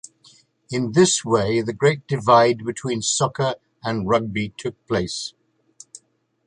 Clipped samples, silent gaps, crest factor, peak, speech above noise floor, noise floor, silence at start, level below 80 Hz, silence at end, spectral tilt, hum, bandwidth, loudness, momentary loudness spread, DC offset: under 0.1%; none; 20 dB; -2 dBFS; 39 dB; -59 dBFS; 0.7 s; -54 dBFS; 1.2 s; -4.5 dB/octave; none; 11 kHz; -21 LUFS; 13 LU; under 0.1%